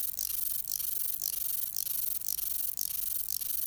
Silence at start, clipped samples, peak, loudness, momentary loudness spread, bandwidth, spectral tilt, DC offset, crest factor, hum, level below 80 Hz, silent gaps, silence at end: 0 s; under 0.1%; -14 dBFS; -30 LUFS; 1 LU; over 20 kHz; 1.5 dB/octave; under 0.1%; 20 dB; none; -62 dBFS; none; 0 s